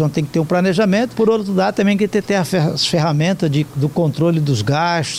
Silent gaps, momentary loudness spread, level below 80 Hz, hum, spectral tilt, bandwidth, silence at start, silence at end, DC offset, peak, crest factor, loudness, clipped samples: none; 2 LU; -52 dBFS; none; -6 dB/octave; 15.5 kHz; 0 s; 0 s; under 0.1%; -6 dBFS; 10 dB; -16 LUFS; under 0.1%